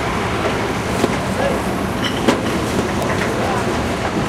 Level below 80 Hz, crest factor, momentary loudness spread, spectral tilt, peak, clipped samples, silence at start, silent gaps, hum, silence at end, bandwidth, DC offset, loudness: -34 dBFS; 16 dB; 3 LU; -5 dB/octave; -2 dBFS; under 0.1%; 0 s; none; none; 0 s; 16 kHz; under 0.1%; -19 LUFS